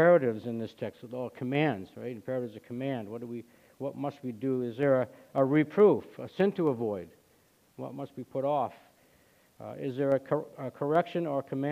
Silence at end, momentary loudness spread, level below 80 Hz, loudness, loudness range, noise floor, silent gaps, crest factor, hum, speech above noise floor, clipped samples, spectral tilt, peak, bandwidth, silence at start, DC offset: 0 s; 15 LU; -74 dBFS; -31 LUFS; 7 LU; -65 dBFS; none; 20 dB; none; 36 dB; under 0.1%; -8.5 dB/octave; -10 dBFS; 15 kHz; 0 s; under 0.1%